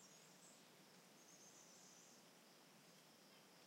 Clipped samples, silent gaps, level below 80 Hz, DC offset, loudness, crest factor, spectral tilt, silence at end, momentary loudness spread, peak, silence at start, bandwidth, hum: under 0.1%; none; under -90 dBFS; under 0.1%; -65 LUFS; 14 dB; -2 dB/octave; 0 s; 3 LU; -52 dBFS; 0 s; 16 kHz; none